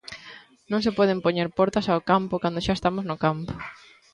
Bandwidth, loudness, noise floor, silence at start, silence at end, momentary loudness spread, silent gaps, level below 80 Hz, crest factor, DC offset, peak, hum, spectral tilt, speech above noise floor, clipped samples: 11 kHz; -24 LUFS; -47 dBFS; 0.05 s; 0.4 s; 16 LU; none; -50 dBFS; 18 dB; under 0.1%; -6 dBFS; none; -6.5 dB/octave; 24 dB; under 0.1%